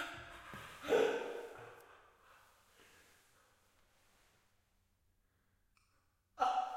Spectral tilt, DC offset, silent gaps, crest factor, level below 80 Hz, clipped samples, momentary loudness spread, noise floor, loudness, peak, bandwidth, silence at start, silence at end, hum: -3.5 dB/octave; under 0.1%; none; 24 dB; -74 dBFS; under 0.1%; 21 LU; -77 dBFS; -39 LUFS; -20 dBFS; 16 kHz; 0 s; 0 s; none